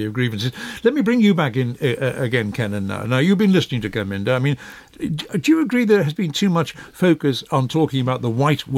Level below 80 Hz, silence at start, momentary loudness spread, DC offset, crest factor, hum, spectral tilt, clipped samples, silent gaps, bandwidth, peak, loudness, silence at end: -54 dBFS; 0 s; 9 LU; under 0.1%; 16 dB; none; -6.5 dB/octave; under 0.1%; none; 16 kHz; -4 dBFS; -19 LUFS; 0 s